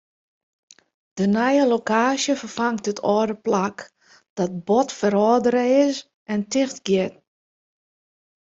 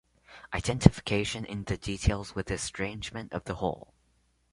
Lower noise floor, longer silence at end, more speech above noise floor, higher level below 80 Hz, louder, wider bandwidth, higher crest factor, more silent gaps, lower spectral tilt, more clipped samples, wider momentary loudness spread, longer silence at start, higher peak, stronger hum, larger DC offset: first, under -90 dBFS vs -70 dBFS; first, 1.35 s vs 0.7 s; first, over 70 dB vs 40 dB; second, -64 dBFS vs -40 dBFS; first, -21 LUFS vs -30 LUFS; second, 8 kHz vs 11.5 kHz; second, 18 dB vs 30 dB; first, 4.29-4.36 s, 6.14-6.26 s vs none; about the same, -5 dB/octave vs -5.5 dB/octave; neither; second, 10 LU vs 14 LU; first, 1.15 s vs 0.3 s; second, -4 dBFS vs 0 dBFS; neither; neither